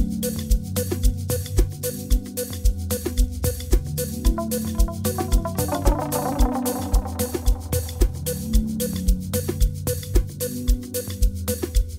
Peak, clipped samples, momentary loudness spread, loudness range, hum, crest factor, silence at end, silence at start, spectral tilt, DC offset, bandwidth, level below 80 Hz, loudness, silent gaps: -4 dBFS; under 0.1%; 4 LU; 1 LU; none; 18 dB; 0 s; 0 s; -5.5 dB/octave; under 0.1%; 16.5 kHz; -24 dBFS; -25 LUFS; none